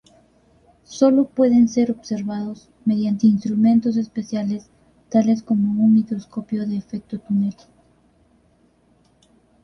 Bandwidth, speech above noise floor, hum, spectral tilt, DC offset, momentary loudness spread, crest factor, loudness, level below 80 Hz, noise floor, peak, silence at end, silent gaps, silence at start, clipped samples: 6.8 kHz; 40 dB; none; -7.5 dB/octave; under 0.1%; 12 LU; 18 dB; -20 LUFS; -60 dBFS; -59 dBFS; -4 dBFS; 2.1 s; none; 0.9 s; under 0.1%